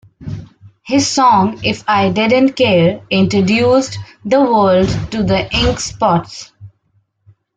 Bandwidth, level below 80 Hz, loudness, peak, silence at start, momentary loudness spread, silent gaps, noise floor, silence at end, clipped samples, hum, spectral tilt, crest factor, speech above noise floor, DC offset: 9.4 kHz; -36 dBFS; -13 LUFS; -2 dBFS; 0.2 s; 16 LU; none; -61 dBFS; 0.9 s; under 0.1%; none; -5 dB/octave; 12 dB; 48 dB; under 0.1%